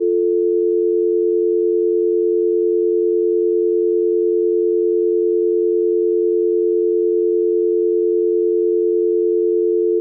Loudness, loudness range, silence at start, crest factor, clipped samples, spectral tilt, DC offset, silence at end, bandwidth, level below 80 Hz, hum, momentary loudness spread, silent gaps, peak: -17 LUFS; 0 LU; 0 s; 6 dB; under 0.1%; -14.5 dB/octave; under 0.1%; 0 s; 0.6 kHz; -88 dBFS; none; 0 LU; none; -10 dBFS